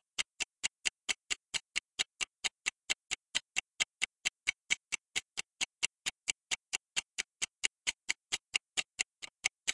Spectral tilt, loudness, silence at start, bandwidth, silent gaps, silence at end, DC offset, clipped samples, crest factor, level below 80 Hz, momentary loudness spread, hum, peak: 2.5 dB/octave; -36 LUFS; 0.2 s; 11.5 kHz; none; 0 s; under 0.1%; under 0.1%; 28 dB; -74 dBFS; 4 LU; none; -10 dBFS